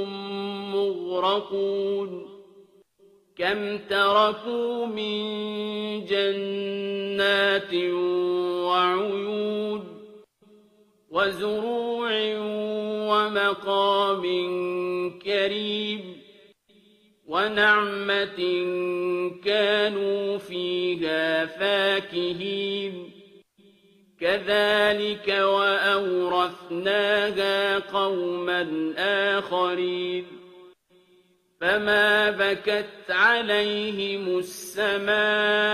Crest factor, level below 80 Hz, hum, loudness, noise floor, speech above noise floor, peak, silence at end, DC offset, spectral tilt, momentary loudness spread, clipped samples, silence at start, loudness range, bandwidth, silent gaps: 18 dB; -68 dBFS; none; -24 LUFS; -62 dBFS; 37 dB; -8 dBFS; 0 s; under 0.1%; -4.5 dB/octave; 9 LU; under 0.1%; 0 s; 5 LU; 14 kHz; none